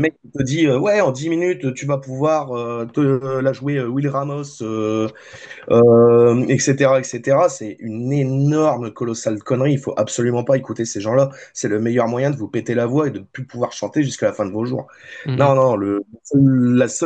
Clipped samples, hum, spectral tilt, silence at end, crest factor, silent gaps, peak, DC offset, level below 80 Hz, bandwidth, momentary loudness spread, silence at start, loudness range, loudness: under 0.1%; none; -6.5 dB/octave; 0 s; 16 dB; none; -2 dBFS; under 0.1%; -58 dBFS; 9 kHz; 11 LU; 0 s; 5 LU; -18 LUFS